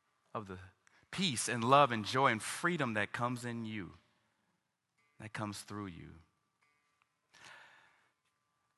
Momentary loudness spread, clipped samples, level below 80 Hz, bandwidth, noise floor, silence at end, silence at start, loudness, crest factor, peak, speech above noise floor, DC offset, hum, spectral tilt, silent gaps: 24 LU; under 0.1%; -70 dBFS; 12 kHz; -83 dBFS; 1.15 s; 0.35 s; -34 LUFS; 26 dB; -12 dBFS; 48 dB; under 0.1%; none; -4 dB/octave; none